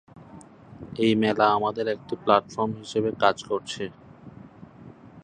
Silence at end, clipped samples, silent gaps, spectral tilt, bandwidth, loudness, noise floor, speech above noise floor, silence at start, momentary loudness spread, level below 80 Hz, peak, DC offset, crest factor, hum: 0.05 s; under 0.1%; none; -5.5 dB/octave; 9.8 kHz; -24 LUFS; -47 dBFS; 23 dB; 0.2 s; 14 LU; -60 dBFS; -4 dBFS; under 0.1%; 22 dB; none